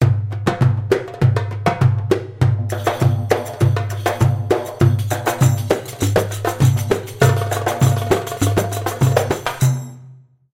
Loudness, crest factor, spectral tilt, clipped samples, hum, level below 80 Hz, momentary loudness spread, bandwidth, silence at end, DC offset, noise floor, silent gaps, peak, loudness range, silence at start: -18 LUFS; 16 dB; -6 dB/octave; under 0.1%; none; -42 dBFS; 5 LU; 16.5 kHz; 0.4 s; under 0.1%; -44 dBFS; none; -2 dBFS; 1 LU; 0 s